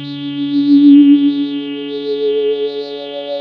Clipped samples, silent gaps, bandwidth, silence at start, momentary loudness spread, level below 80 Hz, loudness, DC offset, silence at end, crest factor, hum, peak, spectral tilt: under 0.1%; none; 5.2 kHz; 0 s; 16 LU; -76 dBFS; -13 LUFS; under 0.1%; 0 s; 12 dB; none; 0 dBFS; -8.5 dB/octave